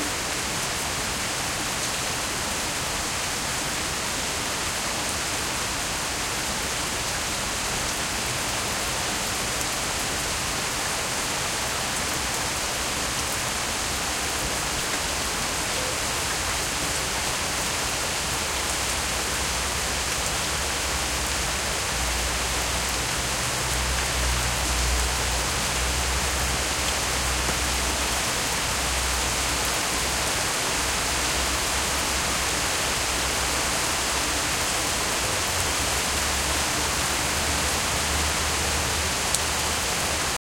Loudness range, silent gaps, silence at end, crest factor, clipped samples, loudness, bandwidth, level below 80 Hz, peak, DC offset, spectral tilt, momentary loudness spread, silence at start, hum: 2 LU; none; 0.05 s; 24 dB; under 0.1%; -24 LUFS; 17 kHz; -36 dBFS; -2 dBFS; under 0.1%; -1.5 dB/octave; 3 LU; 0 s; none